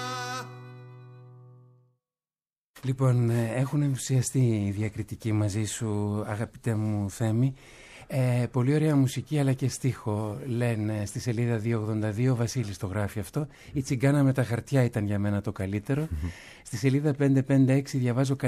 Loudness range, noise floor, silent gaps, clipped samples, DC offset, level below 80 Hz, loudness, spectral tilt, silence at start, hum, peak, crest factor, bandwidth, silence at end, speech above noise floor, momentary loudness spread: 3 LU; under -90 dBFS; 2.66-2.74 s; under 0.1%; under 0.1%; -52 dBFS; -28 LUFS; -7 dB/octave; 0 s; none; -10 dBFS; 16 dB; 14 kHz; 0 s; over 64 dB; 10 LU